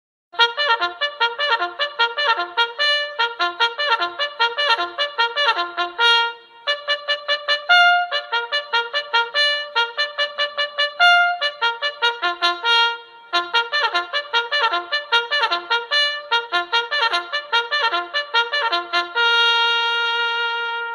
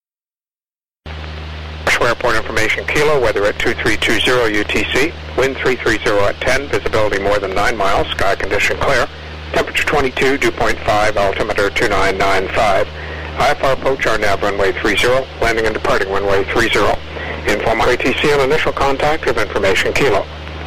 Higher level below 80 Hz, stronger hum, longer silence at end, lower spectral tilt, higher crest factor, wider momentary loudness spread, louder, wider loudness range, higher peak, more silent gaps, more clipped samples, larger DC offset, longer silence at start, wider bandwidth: second, -74 dBFS vs -30 dBFS; neither; about the same, 0 s vs 0 s; second, 1 dB/octave vs -4 dB/octave; first, 20 dB vs 10 dB; about the same, 7 LU vs 5 LU; second, -19 LUFS vs -15 LUFS; about the same, 2 LU vs 1 LU; first, 0 dBFS vs -6 dBFS; neither; neither; second, under 0.1% vs 5%; first, 0.35 s vs 0 s; second, 12 kHz vs 16 kHz